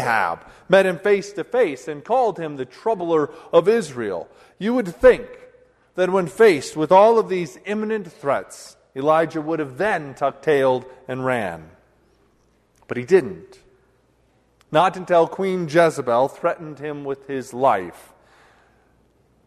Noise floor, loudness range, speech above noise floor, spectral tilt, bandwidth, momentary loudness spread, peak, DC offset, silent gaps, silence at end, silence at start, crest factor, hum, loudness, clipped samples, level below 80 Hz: -61 dBFS; 7 LU; 41 dB; -5.5 dB/octave; 13 kHz; 15 LU; -2 dBFS; under 0.1%; none; 1.55 s; 0 s; 20 dB; none; -20 LUFS; under 0.1%; -54 dBFS